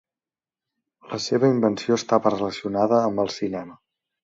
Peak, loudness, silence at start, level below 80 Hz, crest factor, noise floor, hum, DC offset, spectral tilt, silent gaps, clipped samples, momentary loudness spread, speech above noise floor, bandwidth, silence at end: -4 dBFS; -22 LUFS; 1.05 s; -62 dBFS; 18 dB; under -90 dBFS; none; under 0.1%; -5.5 dB/octave; none; under 0.1%; 11 LU; over 68 dB; 7.8 kHz; 0.5 s